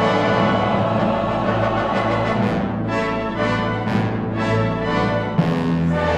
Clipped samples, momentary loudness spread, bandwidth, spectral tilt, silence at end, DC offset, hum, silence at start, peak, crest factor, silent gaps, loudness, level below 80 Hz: under 0.1%; 4 LU; 9.2 kHz; -7.5 dB/octave; 0 s; under 0.1%; none; 0 s; -4 dBFS; 14 dB; none; -20 LUFS; -40 dBFS